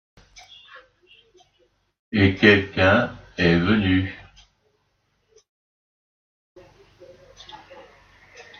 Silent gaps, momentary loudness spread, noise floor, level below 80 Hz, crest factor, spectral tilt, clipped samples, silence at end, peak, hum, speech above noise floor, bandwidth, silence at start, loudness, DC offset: 5.49-6.56 s; 27 LU; -70 dBFS; -54 dBFS; 24 dB; -7 dB/octave; under 0.1%; 1.05 s; 0 dBFS; none; 51 dB; 6.8 kHz; 2.1 s; -19 LUFS; under 0.1%